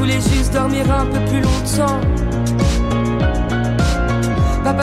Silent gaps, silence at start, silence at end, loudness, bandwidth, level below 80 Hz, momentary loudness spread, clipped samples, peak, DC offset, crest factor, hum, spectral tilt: none; 0 s; 0 s; -17 LUFS; 15 kHz; -22 dBFS; 2 LU; under 0.1%; -6 dBFS; under 0.1%; 10 dB; none; -6 dB/octave